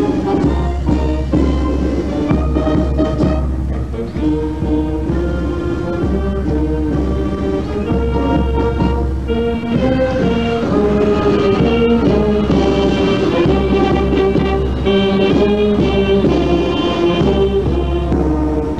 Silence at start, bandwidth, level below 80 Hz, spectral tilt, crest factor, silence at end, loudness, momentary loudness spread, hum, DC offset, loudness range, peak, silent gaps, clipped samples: 0 s; 8.4 kHz; -22 dBFS; -8 dB/octave; 14 dB; 0 s; -15 LUFS; 5 LU; none; 1%; 4 LU; 0 dBFS; none; under 0.1%